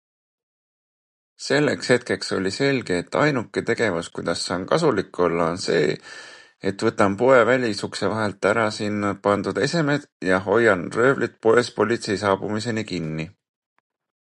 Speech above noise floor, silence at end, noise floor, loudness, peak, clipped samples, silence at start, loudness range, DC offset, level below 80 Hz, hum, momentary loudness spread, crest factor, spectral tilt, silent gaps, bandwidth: over 69 dB; 1 s; under -90 dBFS; -22 LUFS; -2 dBFS; under 0.1%; 1.4 s; 3 LU; under 0.1%; -54 dBFS; none; 9 LU; 20 dB; -5 dB/octave; 10.12-10.20 s; 11.5 kHz